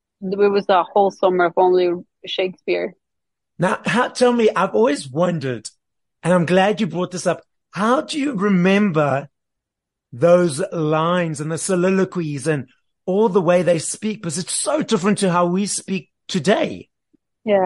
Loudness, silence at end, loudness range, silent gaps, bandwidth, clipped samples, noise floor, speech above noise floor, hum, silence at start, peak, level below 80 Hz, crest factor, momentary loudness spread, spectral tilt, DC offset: -19 LUFS; 0 s; 2 LU; none; 11.5 kHz; under 0.1%; -83 dBFS; 65 dB; none; 0.2 s; -2 dBFS; -64 dBFS; 16 dB; 10 LU; -5 dB/octave; under 0.1%